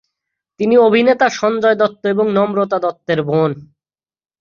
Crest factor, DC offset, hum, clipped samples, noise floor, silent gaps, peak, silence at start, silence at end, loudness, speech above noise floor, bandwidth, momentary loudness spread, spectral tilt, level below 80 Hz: 14 dB; under 0.1%; none; under 0.1%; under -90 dBFS; none; -2 dBFS; 0.6 s; 0.75 s; -15 LUFS; over 76 dB; 7.2 kHz; 8 LU; -6 dB/octave; -60 dBFS